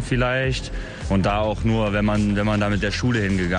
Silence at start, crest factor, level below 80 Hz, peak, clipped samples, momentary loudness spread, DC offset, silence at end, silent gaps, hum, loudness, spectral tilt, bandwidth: 0 s; 12 dB; -32 dBFS; -8 dBFS; under 0.1%; 4 LU; under 0.1%; 0 s; none; none; -21 LUFS; -6.5 dB/octave; 10.5 kHz